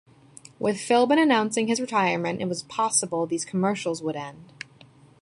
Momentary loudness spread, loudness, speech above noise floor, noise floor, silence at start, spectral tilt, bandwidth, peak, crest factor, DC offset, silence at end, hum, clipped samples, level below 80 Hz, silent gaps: 19 LU; -24 LUFS; 29 dB; -53 dBFS; 0.6 s; -4 dB/octave; 11.5 kHz; -6 dBFS; 18 dB; under 0.1%; 0.75 s; none; under 0.1%; -68 dBFS; none